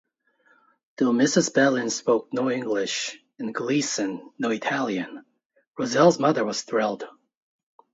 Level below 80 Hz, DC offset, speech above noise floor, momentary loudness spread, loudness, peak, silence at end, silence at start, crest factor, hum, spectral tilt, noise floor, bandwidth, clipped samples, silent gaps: -72 dBFS; under 0.1%; 40 dB; 13 LU; -24 LUFS; -6 dBFS; 0.85 s; 1 s; 20 dB; none; -4 dB/octave; -64 dBFS; 8 kHz; under 0.1%; 5.46-5.50 s, 5.67-5.73 s